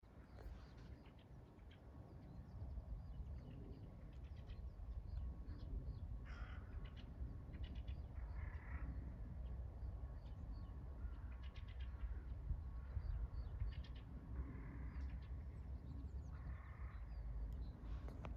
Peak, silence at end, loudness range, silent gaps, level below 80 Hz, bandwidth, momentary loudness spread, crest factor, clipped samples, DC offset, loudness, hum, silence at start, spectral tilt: -34 dBFS; 0 s; 5 LU; none; -52 dBFS; 5.8 kHz; 8 LU; 16 dB; under 0.1%; under 0.1%; -53 LUFS; none; 0 s; -7.5 dB/octave